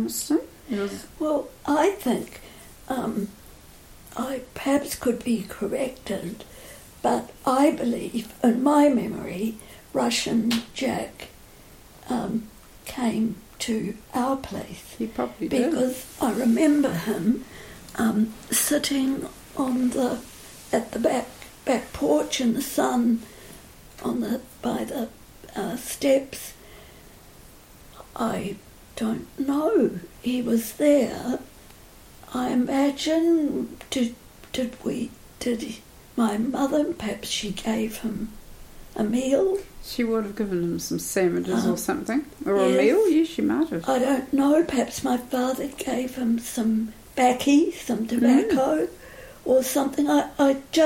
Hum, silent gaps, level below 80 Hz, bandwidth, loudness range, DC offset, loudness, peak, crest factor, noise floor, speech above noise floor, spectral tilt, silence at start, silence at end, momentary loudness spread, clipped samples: none; none; -52 dBFS; 16.5 kHz; 7 LU; under 0.1%; -25 LUFS; -8 dBFS; 18 dB; -48 dBFS; 25 dB; -4.5 dB/octave; 0 s; 0 s; 14 LU; under 0.1%